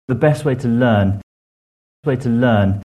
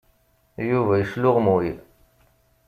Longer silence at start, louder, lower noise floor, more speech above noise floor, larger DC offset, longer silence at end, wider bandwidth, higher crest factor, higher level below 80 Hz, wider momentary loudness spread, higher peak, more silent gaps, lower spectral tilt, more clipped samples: second, 0.1 s vs 0.6 s; first, -17 LUFS vs -22 LUFS; first, under -90 dBFS vs -62 dBFS; first, over 75 dB vs 42 dB; neither; second, 0.1 s vs 0.85 s; second, 12.5 kHz vs 15 kHz; about the same, 16 dB vs 18 dB; first, -46 dBFS vs -54 dBFS; second, 8 LU vs 16 LU; first, 0 dBFS vs -6 dBFS; first, 1.23-2.03 s vs none; about the same, -8 dB/octave vs -9 dB/octave; neither